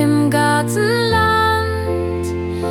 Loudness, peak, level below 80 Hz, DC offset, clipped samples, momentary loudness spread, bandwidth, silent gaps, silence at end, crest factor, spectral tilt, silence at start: -16 LUFS; -4 dBFS; -42 dBFS; under 0.1%; under 0.1%; 8 LU; 17 kHz; none; 0 s; 12 dB; -5.5 dB/octave; 0 s